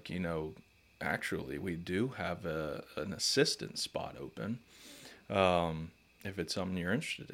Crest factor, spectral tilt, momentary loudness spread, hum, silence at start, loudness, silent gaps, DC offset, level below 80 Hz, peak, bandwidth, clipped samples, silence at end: 24 dB; -4 dB/octave; 15 LU; none; 0 s; -36 LUFS; none; under 0.1%; -62 dBFS; -14 dBFS; 16.5 kHz; under 0.1%; 0 s